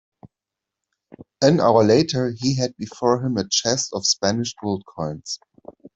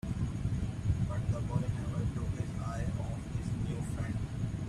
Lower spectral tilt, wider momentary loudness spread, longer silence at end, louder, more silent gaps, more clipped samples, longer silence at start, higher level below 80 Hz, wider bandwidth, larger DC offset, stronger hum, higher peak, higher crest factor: second, -4.5 dB/octave vs -7.5 dB/octave; first, 14 LU vs 4 LU; first, 0.6 s vs 0 s; first, -20 LUFS vs -36 LUFS; neither; neither; first, 0.25 s vs 0.05 s; second, -58 dBFS vs -44 dBFS; second, 8.4 kHz vs 12 kHz; neither; neither; first, -2 dBFS vs -18 dBFS; about the same, 20 dB vs 16 dB